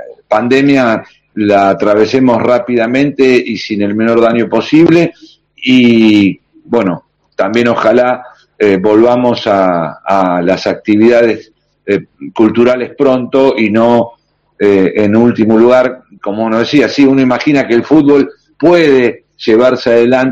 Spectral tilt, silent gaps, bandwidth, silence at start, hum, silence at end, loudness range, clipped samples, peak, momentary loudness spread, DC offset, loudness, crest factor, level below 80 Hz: -6.5 dB/octave; none; 8 kHz; 0 s; none; 0 s; 2 LU; 1%; 0 dBFS; 9 LU; under 0.1%; -10 LUFS; 10 dB; -48 dBFS